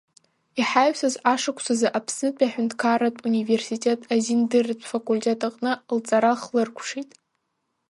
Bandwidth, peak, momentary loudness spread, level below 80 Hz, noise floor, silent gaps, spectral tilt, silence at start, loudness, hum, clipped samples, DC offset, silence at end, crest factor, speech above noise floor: 11.5 kHz; -6 dBFS; 7 LU; -74 dBFS; -76 dBFS; none; -3.5 dB/octave; 0.55 s; -23 LUFS; none; under 0.1%; under 0.1%; 0.9 s; 18 dB; 53 dB